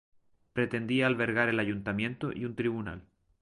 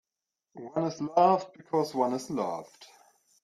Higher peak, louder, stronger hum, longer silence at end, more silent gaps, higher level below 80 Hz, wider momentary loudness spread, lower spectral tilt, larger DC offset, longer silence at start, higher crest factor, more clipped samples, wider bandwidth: about the same, -12 dBFS vs -10 dBFS; about the same, -31 LUFS vs -29 LUFS; neither; second, 0.4 s vs 0.6 s; neither; first, -60 dBFS vs -76 dBFS; about the same, 11 LU vs 12 LU; about the same, -7 dB/octave vs -6 dB/octave; neither; about the same, 0.55 s vs 0.55 s; about the same, 20 dB vs 20 dB; neither; second, 11.5 kHz vs 13.5 kHz